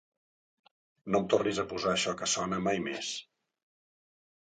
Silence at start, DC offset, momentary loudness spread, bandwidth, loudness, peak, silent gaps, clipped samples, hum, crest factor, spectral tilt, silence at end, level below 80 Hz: 1.05 s; under 0.1%; 9 LU; 9.6 kHz; -31 LUFS; -12 dBFS; none; under 0.1%; none; 22 dB; -3.5 dB/octave; 1.35 s; -66 dBFS